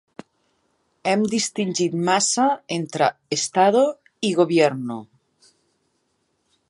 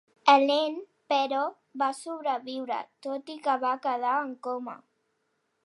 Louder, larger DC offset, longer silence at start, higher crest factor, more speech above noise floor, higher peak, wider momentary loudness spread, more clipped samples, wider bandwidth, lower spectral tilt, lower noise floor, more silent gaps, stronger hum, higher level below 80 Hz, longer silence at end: first, -21 LUFS vs -28 LUFS; neither; first, 1.05 s vs 0.25 s; second, 18 dB vs 24 dB; about the same, 50 dB vs 48 dB; about the same, -4 dBFS vs -6 dBFS; second, 10 LU vs 15 LU; neither; about the same, 11.5 kHz vs 11.5 kHz; first, -4 dB/octave vs -2.5 dB/octave; second, -70 dBFS vs -76 dBFS; neither; neither; first, -72 dBFS vs under -90 dBFS; first, 1.65 s vs 0.85 s